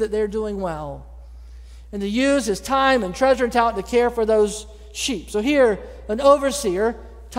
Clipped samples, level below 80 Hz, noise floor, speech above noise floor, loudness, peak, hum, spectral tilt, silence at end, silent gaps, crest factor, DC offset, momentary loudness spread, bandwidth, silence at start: under 0.1%; -40 dBFS; -40 dBFS; 20 dB; -20 LUFS; -2 dBFS; none; -4 dB/octave; 0 s; none; 18 dB; under 0.1%; 14 LU; 16 kHz; 0 s